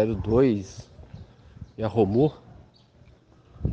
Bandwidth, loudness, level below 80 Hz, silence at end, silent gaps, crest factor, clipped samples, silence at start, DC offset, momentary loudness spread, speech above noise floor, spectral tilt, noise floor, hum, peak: 8 kHz; -24 LUFS; -44 dBFS; 0 s; none; 18 dB; under 0.1%; 0 s; under 0.1%; 25 LU; 32 dB; -8.5 dB/octave; -55 dBFS; none; -8 dBFS